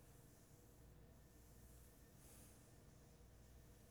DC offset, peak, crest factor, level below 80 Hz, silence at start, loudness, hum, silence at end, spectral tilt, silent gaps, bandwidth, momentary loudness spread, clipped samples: under 0.1%; -52 dBFS; 14 dB; -70 dBFS; 0 s; -66 LUFS; none; 0 s; -4.5 dB/octave; none; over 20 kHz; 3 LU; under 0.1%